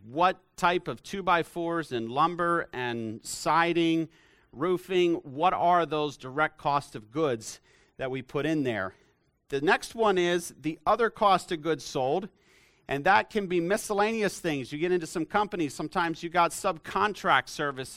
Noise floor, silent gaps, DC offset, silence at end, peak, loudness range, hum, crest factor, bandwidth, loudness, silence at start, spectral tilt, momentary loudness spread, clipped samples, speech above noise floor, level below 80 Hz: -61 dBFS; none; under 0.1%; 0 s; -8 dBFS; 3 LU; none; 20 dB; 16 kHz; -28 LUFS; 0.05 s; -4.5 dB/octave; 9 LU; under 0.1%; 33 dB; -60 dBFS